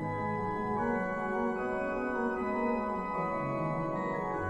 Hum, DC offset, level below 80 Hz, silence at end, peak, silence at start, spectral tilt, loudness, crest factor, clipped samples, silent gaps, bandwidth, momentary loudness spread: none; under 0.1%; -54 dBFS; 0 s; -18 dBFS; 0 s; -8.5 dB/octave; -33 LUFS; 14 dB; under 0.1%; none; 10.5 kHz; 2 LU